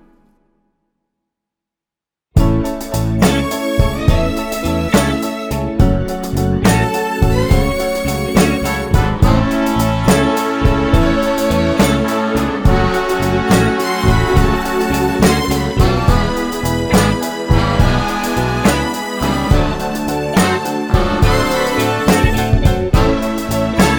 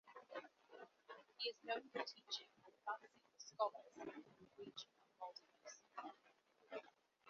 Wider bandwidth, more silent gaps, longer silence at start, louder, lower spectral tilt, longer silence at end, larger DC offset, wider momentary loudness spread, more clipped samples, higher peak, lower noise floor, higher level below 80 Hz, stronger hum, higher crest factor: first, over 20 kHz vs 7 kHz; neither; first, 2.35 s vs 0.05 s; first, -15 LUFS vs -51 LUFS; first, -5.5 dB/octave vs 0.5 dB/octave; about the same, 0 s vs 0 s; neither; second, 5 LU vs 17 LU; neither; first, 0 dBFS vs -28 dBFS; first, -87 dBFS vs -76 dBFS; first, -22 dBFS vs under -90 dBFS; neither; second, 14 dB vs 26 dB